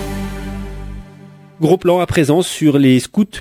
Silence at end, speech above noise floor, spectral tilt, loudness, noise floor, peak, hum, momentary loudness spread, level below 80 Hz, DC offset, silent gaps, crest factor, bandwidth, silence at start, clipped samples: 0 s; 26 dB; -6 dB/octave; -14 LUFS; -39 dBFS; 0 dBFS; none; 18 LU; -34 dBFS; under 0.1%; none; 16 dB; 16 kHz; 0 s; under 0.1%